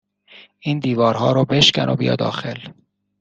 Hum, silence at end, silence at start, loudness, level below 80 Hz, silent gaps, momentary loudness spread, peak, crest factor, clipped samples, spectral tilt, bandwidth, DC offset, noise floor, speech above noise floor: none; 0.5 s; 0.35 s; -17 LUFS; -54 dBFS; none; 15 LU; 0 dBFS; 20 dB; under 0.1%; -5 dB/octave; 9 kHz; under 0.1%; -48 dBFS; 30 dB